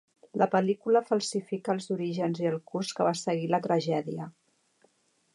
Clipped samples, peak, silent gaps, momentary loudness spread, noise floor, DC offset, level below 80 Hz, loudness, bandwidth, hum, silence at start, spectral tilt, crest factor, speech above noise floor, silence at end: under 0.1%; -10 dBFS; none; 8 LU; -68 dBFS; under 0.1%; -80 dBFS; -29 LUFS; 11.5 kHz; none; 0.35 s; -5.5 dB/octave; 18 dB; 40 dB; 1.05 s